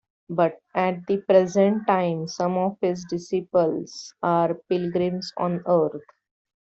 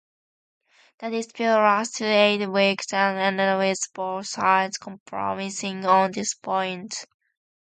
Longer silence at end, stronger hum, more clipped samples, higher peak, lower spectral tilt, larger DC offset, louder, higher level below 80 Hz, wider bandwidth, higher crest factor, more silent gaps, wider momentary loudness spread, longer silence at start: about the same, 0.6 s vs 0.6 s; neither; neither; about the same, -6 dBFS vs -4 dBFS; first, -6.5 dB/octave vs -3.5 dB/octave; neither; about the same, -24 LUFS vs -23 LUFS; first, -66 dBFS vs -72 dBFS; second, 8 kHz vs 9.6 kHz; about the same, 18 dB vs 20 dB; second, none vs 5.00-5.06 s; about the same, 9 LU vs 11 LU; second, 0.3 s vs 1 s